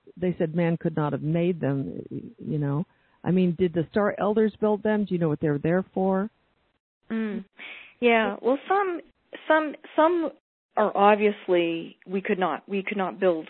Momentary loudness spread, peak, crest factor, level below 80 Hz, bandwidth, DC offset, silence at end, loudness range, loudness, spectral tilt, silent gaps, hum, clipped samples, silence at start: 12 LU; -4 dBFS; 20 dB; -62 dBFS; 4.3 kHz; under 0.1%; 0.05 s; 3 LU; -25 LUFS; -11.5 dB/octave; 6.80-7.01 s, 10.40-10.69 s; none; under 0.1%; 0.05 s